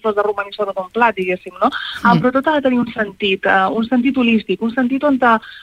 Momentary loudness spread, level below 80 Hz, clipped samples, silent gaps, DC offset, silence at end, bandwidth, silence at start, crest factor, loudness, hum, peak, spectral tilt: 7 LU; -52 dBFS; under 0.1%; none; under 0.1%; 0 s; 9.6 kHz; 0.05 s; 16 dB; -16 LUFS; none; -2 dBFS; -7 dB/octave